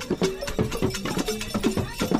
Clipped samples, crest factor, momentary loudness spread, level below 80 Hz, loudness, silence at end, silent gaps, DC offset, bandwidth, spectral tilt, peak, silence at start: under 0.1%; 18 dB; 2 LU; -40 dBFS; -27 LUFS; 0 s; none; under 0.1%; 16 kHz; -5 dB/octave; -8 dBFS; 0 s